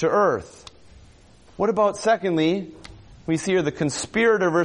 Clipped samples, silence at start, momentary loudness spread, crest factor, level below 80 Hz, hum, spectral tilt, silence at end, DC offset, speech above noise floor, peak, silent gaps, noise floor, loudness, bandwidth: under 0.1%; 0 s; 10 LU; 14 dB; -54 dBFS; none; -5 dB/octave; 0 s; under 0.1%; 30 dB; -8 dBFS; none; -51 dBFS; -22 LUFS; 11 kHz